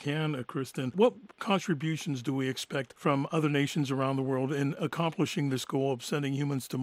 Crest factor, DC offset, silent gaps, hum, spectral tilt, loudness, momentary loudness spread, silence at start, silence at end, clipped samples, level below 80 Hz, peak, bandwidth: 20 dB; under 0.1%; none; none; -6 dB/octave; -31 LUFS; 6 LU; 0 s; 0 s; under 0.1%; -76 dBFS; -12 dBFS; 16 kHz